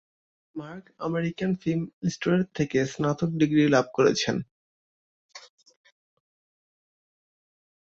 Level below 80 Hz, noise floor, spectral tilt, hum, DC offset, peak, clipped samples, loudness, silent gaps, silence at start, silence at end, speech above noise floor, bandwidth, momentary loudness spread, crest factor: -62 dBFS; under -90 dBFS; -6 dB/octave; none; under 0.1%; -8 dBFS; under 0.1%; -25 LUFS; 1.93-2.01 s, 4.51-5.29 s; 0.55 s; 2.55 s; over 65 dB; 7.8 kHz; 18 LU; 22 dB